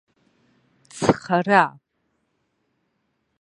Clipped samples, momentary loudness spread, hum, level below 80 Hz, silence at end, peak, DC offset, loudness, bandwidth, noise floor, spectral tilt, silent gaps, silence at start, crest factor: under 0.1%; 7 LU; none; -58 dBFS; 1.7 s; -2 dBFS; under 0.1%; -20 LUFS; 11 kHz; -72 dBFS; -5.5 dB/octave; none; 0.95 s; 24 dB